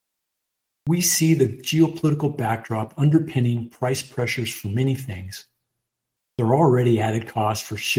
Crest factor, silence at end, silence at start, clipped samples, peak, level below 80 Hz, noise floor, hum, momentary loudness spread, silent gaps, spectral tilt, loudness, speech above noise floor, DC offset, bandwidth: 18 dB; 0 s; 0.85 s; under 0.1%; -4 dBFS; -60 dBFS; -81 dBFS; none; 11 LU; none; -5.5 dB/octave; -22 LUFS; 60 dB; under 0.1%; 19 kHz